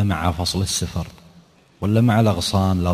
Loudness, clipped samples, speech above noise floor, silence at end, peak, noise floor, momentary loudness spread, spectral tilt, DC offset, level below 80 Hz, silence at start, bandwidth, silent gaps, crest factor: -20 LUFS; under 0.1%; 32 dB; 0 s; -4 dBFS; -51 dBFS; 11 LU; -5.5 dB/octave; under 0.1%; -34 dBFS; 0 s; 15 kHz; none; 16 dB